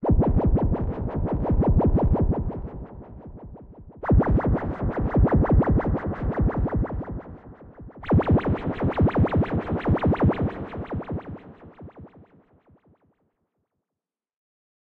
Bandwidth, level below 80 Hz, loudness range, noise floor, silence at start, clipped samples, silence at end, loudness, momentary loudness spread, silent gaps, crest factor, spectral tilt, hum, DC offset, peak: 4.3 kHz; -30 dBFS; 6 LU; -89 dBFS; 0 s; under 0.1%; 2.8 s; -24 LUFS; 22 LU; none; 16 dB; -11.5 dB/octave; none; under 0.1%; -8 dBFS